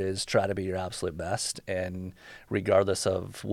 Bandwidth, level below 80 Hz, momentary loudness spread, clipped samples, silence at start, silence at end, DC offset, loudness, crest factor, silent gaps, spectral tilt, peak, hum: 16 kHz; -56 dBFS; 11 LU; under 0.1%; 0 s; 0 s; under 0.1%; -29 LUFS; 20 dB; none; -4.5 dB/octave; -10 dBFS; none